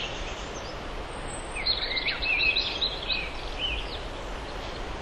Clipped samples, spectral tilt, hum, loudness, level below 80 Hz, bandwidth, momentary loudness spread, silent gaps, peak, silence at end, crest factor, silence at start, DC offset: under 0.1%; -2.5 dB/octave; none; -29 LUFS; -40 dBFS; 12 kHz; 14 LU; none; -12 dBFS; 0 s; 18 dB; 0 s; under 0.1%